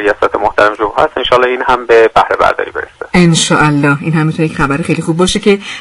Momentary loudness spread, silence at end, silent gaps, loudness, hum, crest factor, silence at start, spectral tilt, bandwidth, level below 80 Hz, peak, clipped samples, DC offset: 6 LU; 0 s; none; -11 LUFS; none; 10 dB; 0 s; -5 dB/octave; 11.5 kHz; -34 dBFS; 0 dBFS; 0.3%; under 0.1%